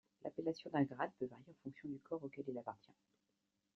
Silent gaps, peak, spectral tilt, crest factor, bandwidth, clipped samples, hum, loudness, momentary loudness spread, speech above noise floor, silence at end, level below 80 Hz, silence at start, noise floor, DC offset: none; -24 dBFS; -6 dB/octave; 22 dB; 6.8 kHz; under 0.1%; none; -45 LUFS; 13 LU; 42 dB; 1 s; -84 dBFS; 0.25 s; -86 dBFS; under 0.1%